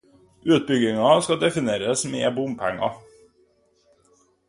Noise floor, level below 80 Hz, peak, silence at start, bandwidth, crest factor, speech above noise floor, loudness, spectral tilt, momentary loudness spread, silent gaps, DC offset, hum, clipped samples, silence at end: -62 dBFS; -62 dBFS; -2 dBFS; 0.45 s; 11.5 kHz; 22 dB; 41 dB; -22 LUFS; -4.5 dB/octave; 9 LU; none; under 0.1%; none; under 0.1%; 1.5 s